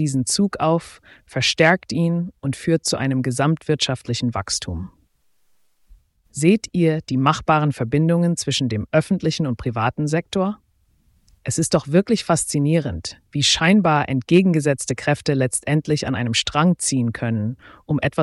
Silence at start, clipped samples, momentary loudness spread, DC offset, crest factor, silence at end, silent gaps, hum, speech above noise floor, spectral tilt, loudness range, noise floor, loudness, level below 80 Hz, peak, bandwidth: 0 s; under 0.1%; 9 LU; under 0.1%; 18 dB; 0 s; none; none; 42 dB; -5 dB/octave; 5 LU; -62 dBFS; -20 LUFS; -48 dBFS; -2 dBFS; 12 kHz